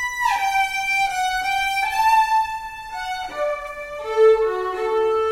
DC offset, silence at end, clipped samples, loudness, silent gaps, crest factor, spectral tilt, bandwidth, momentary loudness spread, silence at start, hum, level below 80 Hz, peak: under 0.1%; 0 s; under 0.1%; -20 LUFS; none; 16 dB; -1.5 dB/octave; 16 kHz; 13 LU; 0 s; none; -48 dBFS; -6 dBFS